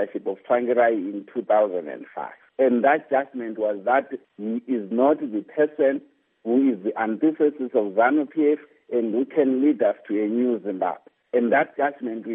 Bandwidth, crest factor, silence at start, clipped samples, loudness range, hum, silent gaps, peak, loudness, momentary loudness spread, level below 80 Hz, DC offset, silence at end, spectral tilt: 3.7 kHz; 18 dB; 0 s; under 0.1%; 2 LU; none; none; -6 dBFS; -23 LUFS; 11 LU; -84 dBFS; under 0.1%; 0 s; -5 dB/octave